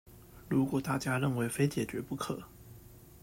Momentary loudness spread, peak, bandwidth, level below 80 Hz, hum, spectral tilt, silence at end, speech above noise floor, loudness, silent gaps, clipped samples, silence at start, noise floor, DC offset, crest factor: 22 LU; -16 dBFS; 16 kHz; -60 dBFS; none; -6 dB/octave; 0.05 s; 21 dB; -33 LUFS; none; under 0.1%; 0.05 s; -54 dBFS; under 0.1%; 18 dB